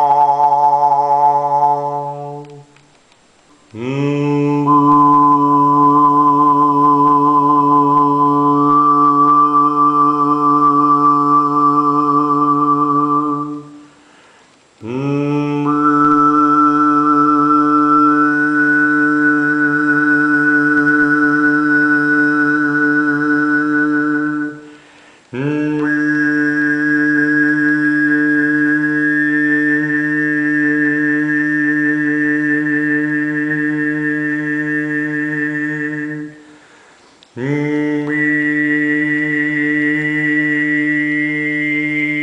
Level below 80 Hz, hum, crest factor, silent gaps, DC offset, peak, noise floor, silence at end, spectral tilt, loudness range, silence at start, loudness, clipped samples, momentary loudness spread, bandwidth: -60 dBFS; none; 12 dB; none; under 0.1%; -2 dBFS; -51 dBFS; 0 s; -7.5 dB/octave; 7 LU; 0 s; -13 LUFS; under 0.1%; 7 LU; 8 kHz